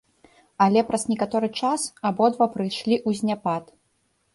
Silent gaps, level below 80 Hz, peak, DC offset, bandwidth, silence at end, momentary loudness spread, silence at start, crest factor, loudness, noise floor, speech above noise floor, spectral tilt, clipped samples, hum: none; -64 dBFS; -6 dBFS; under 0.1%; 11.5 kHz; 0.7 s; 7 LU; 0.6 s; 18 dB; -23 LUFS; -69 dBFS; 46 dB; -5 dB/octave; under 0.1%; none